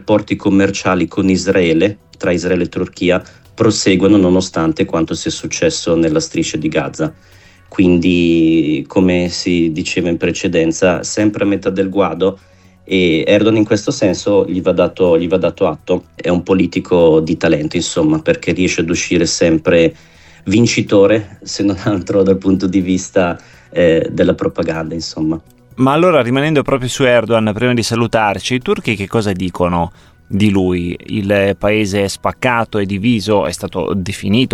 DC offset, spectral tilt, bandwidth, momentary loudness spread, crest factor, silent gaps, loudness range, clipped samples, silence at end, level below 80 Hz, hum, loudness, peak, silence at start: under 0.1%; -5.5 dB/octave; 13 kHz; 8 LU; 12 dB; none; 2 LU; under 0.1%; 0.05 s; -42 dBFS; none; -14 LUFS; -2 dBFS; 0 s